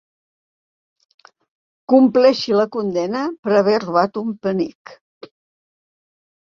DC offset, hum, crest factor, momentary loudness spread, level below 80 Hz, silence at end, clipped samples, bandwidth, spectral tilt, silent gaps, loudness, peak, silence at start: under 0.1%; none; 18 dB; 10 LU; -64 dBFS; 1.55 s; under 0.1%; 7.2 kHz; -6.5 dB/octave; 3.39-3.43 s, 4.75-4.85 s; -17 LUFS; -2 dBFS; 1.9 s